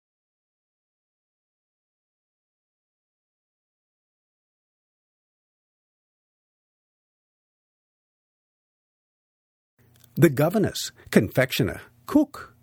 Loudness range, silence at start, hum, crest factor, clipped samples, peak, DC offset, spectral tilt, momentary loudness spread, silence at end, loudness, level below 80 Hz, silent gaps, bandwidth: 5 LU; 10.15 s; none; 30 dB; under 0.1%; 0 dBFS; under 0.1%; -6 dB/octave; 11 LU; 0.15 s; -23 LUFS; -60 dBFS; none; over 20 kHz